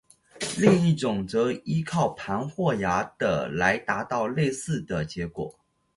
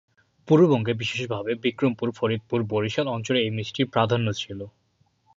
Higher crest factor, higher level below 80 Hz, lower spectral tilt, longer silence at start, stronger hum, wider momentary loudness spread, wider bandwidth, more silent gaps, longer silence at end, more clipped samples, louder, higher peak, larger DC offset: about the same, 22 dB vs 18 dB; first, -54 dBFS vs -60 dBFS; about the same, -6 dB/octave vs -6.5 dB/octave; about the same, 0.35 s vs 0.45 s; neither; about the same, 11 LU vs 9 LU; first, 11.5 kHz vs 7.8 kHz; neither; second, 0.45 s vs 0.65 s; neither; about the same, -26 LUFS vs -24 LUFS; about the same, -4 dBFS vs -6 dBFS; neither